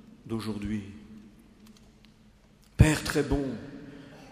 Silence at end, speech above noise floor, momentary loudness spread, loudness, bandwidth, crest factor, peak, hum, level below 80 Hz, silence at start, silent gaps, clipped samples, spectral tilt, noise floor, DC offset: 0 s; 28 dB; 25 LU; -28 LUFS; 15.5 kHz; 26 dB; -6 dBFS; none; -40 dBFS; 0.25 s; none; under 0.1%; -6 dB/octave; -58 dBFS; under 0.1%